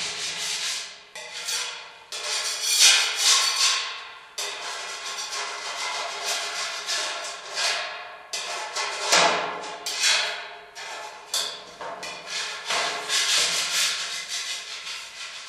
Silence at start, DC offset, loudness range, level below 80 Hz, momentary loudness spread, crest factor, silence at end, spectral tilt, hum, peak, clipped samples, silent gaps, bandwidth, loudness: 0 s; under 0.1%; 7 LU; -74 dBFS; 17 LU; 24 dB; 0 s; 2 dB/octave; none; -2 dBFS; under 0.1%; none; 15.5 kHz; -24 LUFS